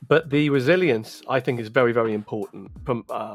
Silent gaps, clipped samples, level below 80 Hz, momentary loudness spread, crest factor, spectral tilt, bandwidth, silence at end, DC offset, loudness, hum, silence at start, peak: none; under 0.1%; -54 dBFS; 13 LU; 18 dB; -7 dB/octave; 15 kHz; 0 s; under 0.1%; -22 LUFS; none; 0 s; -4 dBFS